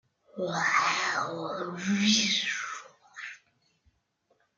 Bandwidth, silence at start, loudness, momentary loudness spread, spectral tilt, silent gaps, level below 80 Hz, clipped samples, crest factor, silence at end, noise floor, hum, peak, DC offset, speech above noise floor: 7.8 kHz; 0.35 s; -27 LUFS; 19 LU; -2.5 dB/octave; none; -76 dBFS; under 0.1%; 22 dB; 1.2 s; -73 dBFS; none; -10 dBFS; under 0.1%; 45 dB